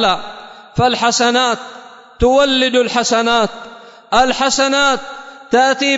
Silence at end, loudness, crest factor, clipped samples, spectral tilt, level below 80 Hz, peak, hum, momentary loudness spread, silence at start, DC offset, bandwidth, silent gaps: 0 s; -14 LUFS; 14 dB; under 0.1%; -3 dB/octave; -36 dBFS; -2 dBFS; none; 19 LU; 0 s; under 0.1%; 8 kHz; none